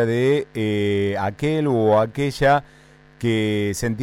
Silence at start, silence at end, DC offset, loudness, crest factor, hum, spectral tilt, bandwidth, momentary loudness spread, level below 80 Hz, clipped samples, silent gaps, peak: 0 s; 0 s; under 0.1%; -21 LUFS; 14 dB; none; -6 dB/octave; 16 kHz; 6 LU; -46 dBFS; under 0.1%; none; -8 dBFS